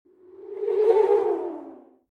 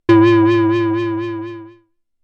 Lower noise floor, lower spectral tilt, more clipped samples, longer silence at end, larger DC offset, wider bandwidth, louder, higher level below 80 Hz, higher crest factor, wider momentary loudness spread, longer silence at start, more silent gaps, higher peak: second, -45 dBFS vs -55 dBFS; second, -6 dB/octave vs -8.5 dB/octave; neither; second, 0.35 s vs 0.55 s; neither; second, 4.8 kHz vs 6.2 kHz; second, -22 LUFS vs -14 LUFS; second, -78 dBFS vs -54 dBFS; about the same, 16 dB vs 12 dB; about the same, 19 LU vs 19 LU; first, 0.4 s vs 0.1 s; neither; second, -8 dBFS vs -2 dBFS